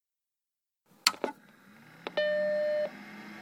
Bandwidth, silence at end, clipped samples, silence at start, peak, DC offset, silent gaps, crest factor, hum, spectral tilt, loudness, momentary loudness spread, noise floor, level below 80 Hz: 17.5 kHz; 0 s; under 0.1%; 1.05 s; -4 dBFS; under 0.1%; none; 32 dB; none; -1.5 dB/octave; -31 LUFS; 16 LU; -89 dBFS; -84 dBFS